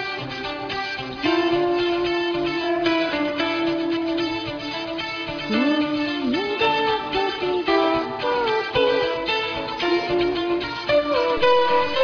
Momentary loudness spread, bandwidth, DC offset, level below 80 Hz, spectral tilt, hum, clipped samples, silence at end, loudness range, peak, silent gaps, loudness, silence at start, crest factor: 7 LU; 5.4 kHz; under 0.1%; -50 dBFS; -5 dB/octave; none; under 0.1%; 0 s; 2 LU; -8 dBFS; none; -22 LUFS; 0 s; 14 dB